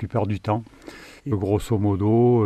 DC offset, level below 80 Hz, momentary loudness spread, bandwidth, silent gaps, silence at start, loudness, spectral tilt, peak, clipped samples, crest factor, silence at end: under 0.1%; -46 dBFS; 23 LU; 13 kHz; none; 0 s; -23 LUFS; -8.5 dB/octave; -8 dBFS; under 0.1%; 14 dB; 0 s